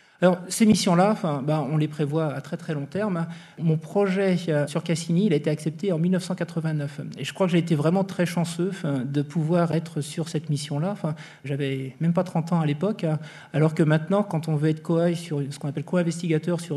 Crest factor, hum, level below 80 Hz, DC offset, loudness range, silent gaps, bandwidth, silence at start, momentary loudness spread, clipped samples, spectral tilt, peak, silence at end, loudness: 18 dB; none; -72 dBFS; under 0.1%; 3 LU; none; 13 kHz; 0.2 s; 9 LU; under 0.1%; -6.5 dB/octave; -6 dBFS; 0 s; -25 LUFS